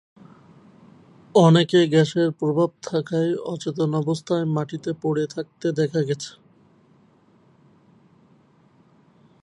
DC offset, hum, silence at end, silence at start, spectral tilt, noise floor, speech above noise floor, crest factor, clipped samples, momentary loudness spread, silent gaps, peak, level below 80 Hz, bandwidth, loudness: under 0.1%; none; 3.15 s; 1.35 s; -6.5 dB/octave; -57 dBFS; 36 dB; 22 dB; under 0.1%; 12 LU; none; -2 dBFS; -68 dBFS; 10 kHz; -22 LUFS